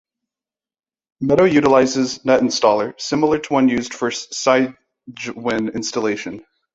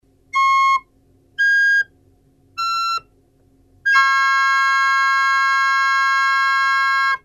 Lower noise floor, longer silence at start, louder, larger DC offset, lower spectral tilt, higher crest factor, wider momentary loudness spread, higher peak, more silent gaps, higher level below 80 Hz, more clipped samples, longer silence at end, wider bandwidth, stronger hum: first, under -90 dBFS vs -56 dBFS; first, 1.2 s vs 0.35 s; about the same, -18 LUFS vs -16 LUFS; neither; first, -4.5 dB/octave vs 2.5 dB/octave; first, 18 dB vs 12 dB; about the same, 12 LU vs 10 LU; first, -2 dBFS vs -6 dBFS; neither; first, -54 dBFS vs -62 dBFS; neither; first, 0.35 s vs 0.05 s; second, 8 kHz vs 14.5 kHz; neither